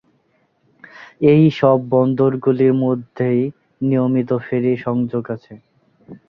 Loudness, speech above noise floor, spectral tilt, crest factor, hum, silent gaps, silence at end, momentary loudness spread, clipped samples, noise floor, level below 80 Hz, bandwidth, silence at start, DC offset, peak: -17 LUFS; 46 dB; -10 dB/octave; 16 dB; none; none; 0.15 s; 11 LU; under 0.1%; -62 dBFS; -58 dBFS; 6 kHz; 1 s; under 0.1%; -2 dBFS